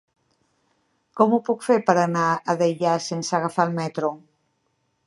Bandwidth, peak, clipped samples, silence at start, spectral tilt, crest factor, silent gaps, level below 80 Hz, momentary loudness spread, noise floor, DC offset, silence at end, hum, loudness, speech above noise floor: 11.5 kHz; -2 dBFS; under 0.1%; 1.15 s; -5.5 dB/octave; 22 dB; none; -74 dBFS; 8 LU; -71 dBFS; under 0.1%; 0.9 s; none; -22 LUFS; 50 dB